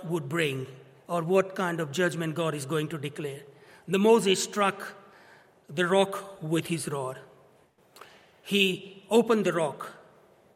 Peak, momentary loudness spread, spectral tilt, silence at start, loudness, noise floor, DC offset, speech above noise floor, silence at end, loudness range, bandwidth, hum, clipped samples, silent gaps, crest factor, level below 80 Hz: -8 dBFS; 17 LU; -4.5 dB/octave; 0 s; -27 LUFS; -61 dBFS; under 0.1%; 34 dB; 0.6 s; 4 LU; 16.5 kHz; none; under 0.1%; none; 20 dB; -76 dBFS